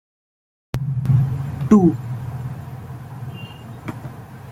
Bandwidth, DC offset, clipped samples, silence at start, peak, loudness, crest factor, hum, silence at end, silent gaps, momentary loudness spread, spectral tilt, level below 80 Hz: 15 kHz; under 0.1%; under 0.1%; 0.75 s; -2 dBFS; -20 LUFS; 20 dB; none; 0 s; none; 20 LU; -9 dB/octave; -46 dBFS